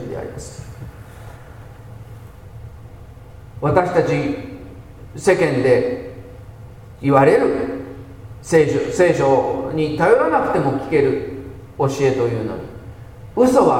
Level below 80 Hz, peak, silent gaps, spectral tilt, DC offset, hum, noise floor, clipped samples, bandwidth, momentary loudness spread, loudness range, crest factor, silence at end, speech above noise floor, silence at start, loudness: -44 dBFS; 0 dBFS; none; -6.5 dB/octave; under 0.1%; none; -38 dBFS; under 0.1%; 15.5 kHz; 24 LU; 7 LU; 18 dB; 0 s; 22 dB; 0 s; -18 LUFS